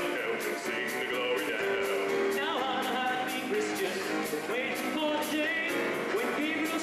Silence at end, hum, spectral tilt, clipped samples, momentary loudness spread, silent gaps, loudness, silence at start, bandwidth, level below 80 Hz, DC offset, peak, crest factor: 0 s; none; -3 dB/octave; under 0.1%; 3 LU; none; -30 LUFS; 0 s; 15.5 kHz; -70 dBFS; under 0.1%; -20 dBFS; 12 dB